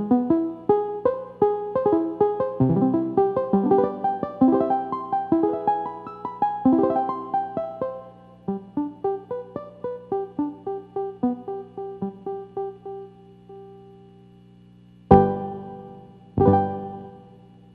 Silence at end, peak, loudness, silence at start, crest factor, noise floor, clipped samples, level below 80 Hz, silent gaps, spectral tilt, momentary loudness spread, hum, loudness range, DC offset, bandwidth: 0.5 s; 0 dBFS; -24 LUFS; 0 s; 24 dB; -50 dBFS; under 0.1%; -50 dBFS; none; -11.5 dB/octave; 17 LU; 60 Hz at -50 dBFS; 10 LU; under 0.1%; 4.5 kHz